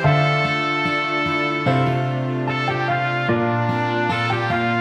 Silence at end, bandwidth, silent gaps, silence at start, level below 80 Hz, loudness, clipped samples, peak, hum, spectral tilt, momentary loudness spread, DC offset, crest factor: 0 s; 9.4 kHz; none; 0 s; -54 dBFS; -20 LUFS; under 0.1%; -4 dBFS; none; -7 dB/octave; 3 LU; under 0.1%; 16 dB